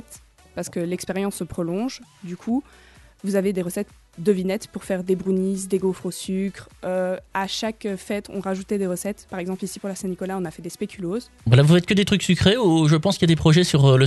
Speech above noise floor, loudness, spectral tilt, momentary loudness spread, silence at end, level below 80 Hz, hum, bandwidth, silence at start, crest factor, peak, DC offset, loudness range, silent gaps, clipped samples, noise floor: 26 dB; -22 LUFS; -6 dB/octave; 14 LU; 0 s; -50 dBFS; none; 12 kHz; 0.1 s; 20 dB; -2 dBFS; under 0.1%; 9 LU; none; under 0.1%; -48 dBFS